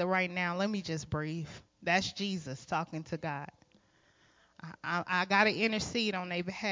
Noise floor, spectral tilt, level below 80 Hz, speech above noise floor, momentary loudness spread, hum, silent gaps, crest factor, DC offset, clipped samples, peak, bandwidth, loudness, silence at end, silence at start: -67 dBFS; -4.5 dB/octave; -62 dBFS; 34 dB; 14 LU; none; none; 22 dB; under 0.1%; under 0.1%; -12 dBFS; 7.6 kHz; -33 LUFS; 0 s; 0 s